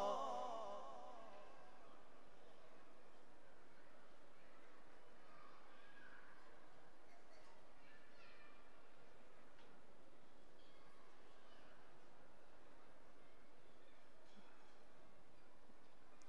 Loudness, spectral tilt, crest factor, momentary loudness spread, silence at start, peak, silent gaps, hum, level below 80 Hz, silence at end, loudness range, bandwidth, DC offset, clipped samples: -61 LUFS; -4.5 dB/octave; 26 dB; 13 LU; 0 s; -34 dBFS; none; none; -82 dBFS; 0 s; 7 LU; 11 kHz; 0.3%; under 0.1%